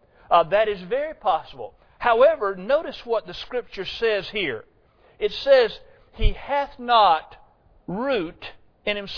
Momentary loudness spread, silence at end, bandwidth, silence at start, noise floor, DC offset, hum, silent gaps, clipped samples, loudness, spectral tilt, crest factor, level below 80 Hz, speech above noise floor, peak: 16 LU; 0 s; 5.4 kHz; 0.3 s; -54 dBFS; under 0.1%; none; none; under 0.1%; -22 LUFS; -6 dB/octave; 18 dB; -36 dBFS; 32 dB; -4 dBFS